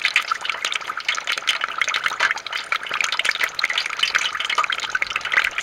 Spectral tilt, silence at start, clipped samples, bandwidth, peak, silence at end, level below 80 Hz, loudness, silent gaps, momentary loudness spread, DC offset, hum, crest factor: 1.5 dB/octave; 0 s; under 0.1%; 17 kHz; -4 dBFS; 0 s; -62 dBFS; -21 LUFS; none; 5 LU; under 0.1%; none; 20 dB